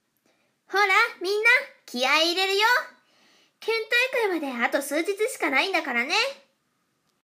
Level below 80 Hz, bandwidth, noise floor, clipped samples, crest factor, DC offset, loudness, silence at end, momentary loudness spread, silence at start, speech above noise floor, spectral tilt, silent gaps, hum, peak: under -90 dBFS; 15.5 kHz; -72 dBFS; under 0.1%; 20 dB; under 0.1%; -22 LUFS; 0.9 s; 9 LU; 0.7 s; 49 dB; 0 dB/octave; none; none; -6 dBFS